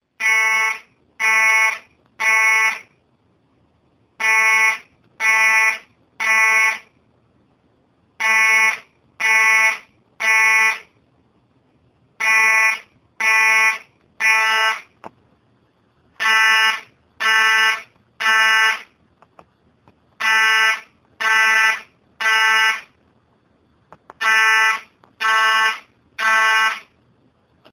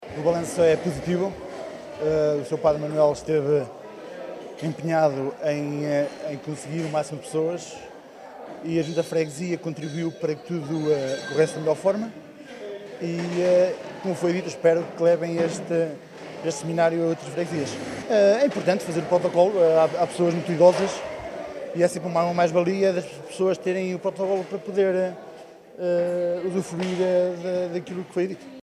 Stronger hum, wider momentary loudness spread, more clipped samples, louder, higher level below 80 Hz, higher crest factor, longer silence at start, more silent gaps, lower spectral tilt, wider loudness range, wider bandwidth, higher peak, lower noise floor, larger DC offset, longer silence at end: neither; second, 13 LU vs 16 LU; neither; first, -15 LUFS vs -24 LUFS; second, -72 dBFS vs -60 dBFS; about the same, 18 dB vs 20 dB; first, 0.2 s vs 0 s; neither; second, 2.5 dB/octave vs -6 dB/octave; second, 2 LU vs 7 LU; first, 19.5 kHz vs 13 kHz; first, 0 dBFS vs -4 dBFS; first, -61 dBFS vs -44 dBFS; neither; first, 0.9 s vs 0 s